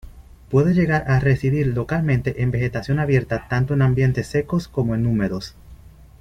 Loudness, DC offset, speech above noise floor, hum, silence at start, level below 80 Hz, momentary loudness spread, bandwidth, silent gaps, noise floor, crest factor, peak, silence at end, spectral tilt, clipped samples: -20 LUFS; under 0.1%; 24 dB; none; 0.05 s; -40 dBFS; 6 LU; 9.6 kHz; none; -44 dBFS; 14 dB; -6 dBFS; 0.35 s; -8 dB/octave; under 0.1%